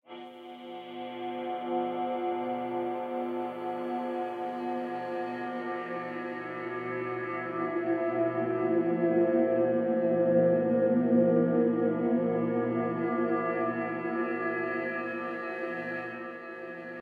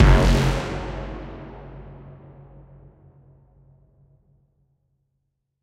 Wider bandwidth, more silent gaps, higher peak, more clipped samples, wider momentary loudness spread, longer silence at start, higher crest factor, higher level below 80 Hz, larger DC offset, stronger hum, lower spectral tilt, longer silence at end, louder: second, 4.8 kHz vs 12 kHz; neither; second, -14 dBFS vs -2 dBFS; neither; second, 12 LU vs 28 LU; about the same, 0.1 s vs 0 s; second, 16 dB vs 22 dB; second, -76 dBFS vs -28 dBFS; neither; neither; first, -9 dB/octave vs -6.5 dB/octave; second, 0 s vs 3.5 s; second, -30 LUFS vs -22 LUFS